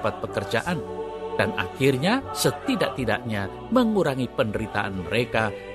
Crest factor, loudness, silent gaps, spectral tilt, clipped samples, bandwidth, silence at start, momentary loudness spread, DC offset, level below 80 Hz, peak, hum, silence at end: 20 dB; -25 LUFS; none; -5 dB/octave; under 0.1%; 13 kHz; 0 s; 8 LU; under 0.1%; -50 dBFS; -4 dBFS; none; 0 s